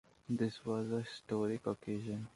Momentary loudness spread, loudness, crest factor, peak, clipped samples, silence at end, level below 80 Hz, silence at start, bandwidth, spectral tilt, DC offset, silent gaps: 4 LU; -39 LUFS; 18 dB; -22 dBFS; under 0.1%; 0.05 s; -72 dBFS; 0.3 s; 11.5 kHz; -7 dB/octave; under 0.1%; none